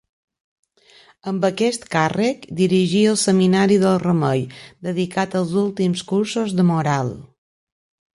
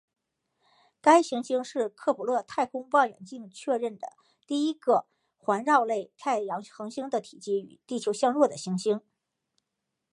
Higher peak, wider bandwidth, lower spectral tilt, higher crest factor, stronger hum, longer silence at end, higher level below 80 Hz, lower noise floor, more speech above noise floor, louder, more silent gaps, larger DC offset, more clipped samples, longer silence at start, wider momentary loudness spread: about the same, -4 dBFS vs -6 dBFS; about the same, 11.5 kHz vs 11.5 kHz; about the same, -5.5 dB/octave vs -4.5 dB/octave; second, 16 dB vs 22 dB; neither; second, 0.95 s vs 1.15 s; first, -58 dBFS vs -82 dBFS; second, -52 dBFS vs -84 dBFS; second, 33 dB vs 57 dB; first, -19 LUFS vs -28 LUFS; neither; neither; neither; first, 1.25 s vs 1.05 s; about the same, 11 LU vs 12 LU